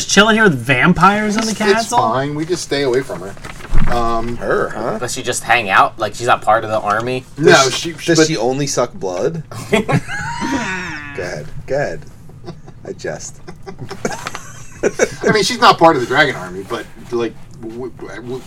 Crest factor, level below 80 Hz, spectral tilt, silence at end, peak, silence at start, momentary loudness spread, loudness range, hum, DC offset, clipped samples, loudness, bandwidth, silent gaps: 16 dB; -28 dBFS; -4 dB/octave; 0 s; 0 dBFS; 0 s; 20 LU; 10 LU; none; under 0.1%; 0.3%; -15 LUFS; 15.5 kHz; none